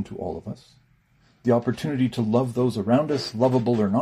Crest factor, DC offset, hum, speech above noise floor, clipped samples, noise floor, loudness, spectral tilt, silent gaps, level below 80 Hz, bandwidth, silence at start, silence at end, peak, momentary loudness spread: 16 dB; under 0.1%; none; 38 dB; under 0.1%; -61 dBFS; -23 LUFS; -7.5 dB/octave; none; -58 dBFS; 13.5 kHz; 0 s; 0 s; -8 dBFS; 11 LU